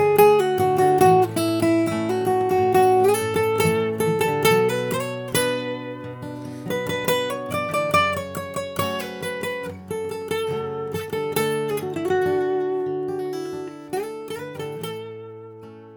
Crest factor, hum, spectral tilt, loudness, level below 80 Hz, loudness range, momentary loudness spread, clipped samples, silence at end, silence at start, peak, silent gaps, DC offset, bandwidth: 18 dB; none; -5 dB/octave; -22 LUFS; -60 dBFS; 8 LU; 15 LU; under 0.1%; 0 s; 0 s; -4 dBFS; none; under 0.1%; over 20 kHz